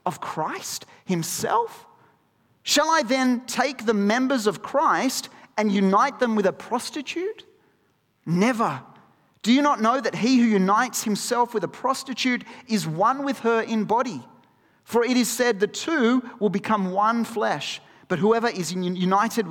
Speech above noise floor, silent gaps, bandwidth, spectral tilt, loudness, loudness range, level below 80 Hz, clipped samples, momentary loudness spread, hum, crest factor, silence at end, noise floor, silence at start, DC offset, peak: 44 dB; none; 18 kHz; -4.5 dB/octave; -23 LUFS; 3 LU; -70 dBFS; under 0.1%; 10 LU; none; 18 dB; 0 s; -66 dBFS; 0.05 s; under 0.1%; -6 dBFS